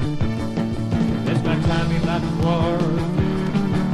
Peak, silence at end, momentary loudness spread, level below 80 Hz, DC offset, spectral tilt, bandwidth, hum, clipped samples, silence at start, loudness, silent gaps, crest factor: -8 dBFS; 0 s; 4 LU; -34 dBFS; under 0.1%; -7.5 dB/octave; 12 kHz; none; under 0.1%; 0 s; -21 LUFS; none; 12 dB